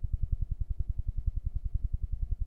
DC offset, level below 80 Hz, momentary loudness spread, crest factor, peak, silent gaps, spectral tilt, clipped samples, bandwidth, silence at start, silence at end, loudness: under 0.1%; -32 dBFS; 2 LU; 16 dB; -16 dBFS; none; -11 dB/octave; under 0.1%; 0.8 kHz; 0 s; 0 s; -37 LUFS